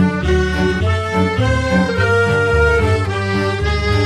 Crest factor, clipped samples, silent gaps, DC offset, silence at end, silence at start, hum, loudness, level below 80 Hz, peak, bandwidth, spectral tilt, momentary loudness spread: 12 dB; under 0.1%; none; under 0.1%; 0 s; 0 s; none; -16 LUFS; -24 dBFS; -2 dBFS; 11.5 kHz; -6.5 dB/octave; 4 LU